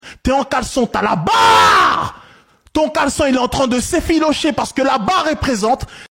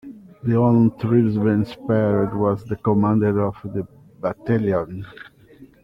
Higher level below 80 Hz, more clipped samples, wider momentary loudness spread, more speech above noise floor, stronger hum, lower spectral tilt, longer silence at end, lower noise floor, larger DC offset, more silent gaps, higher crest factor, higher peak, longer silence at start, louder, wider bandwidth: first, -36 dBFS vs -52 dBFS; neither; second, 9 LU vs 12 LU; first, 33 dB vs 28 dB; neither; second, -4 dB/octave vs -10.5 dB/octave; second, 0.05 s vs 0.2 s; about the same, -48 dBFS vs -48 dBFS; neither; neither; about the same, 12 dB vs 16 dB; first, -2 dBFS vs -6 dBFS; about the same, 0.05 s vs 0.05 s; first, -15 LUFS vs -20 LUFS; first, 16.5 kHz vs 5.6 kHz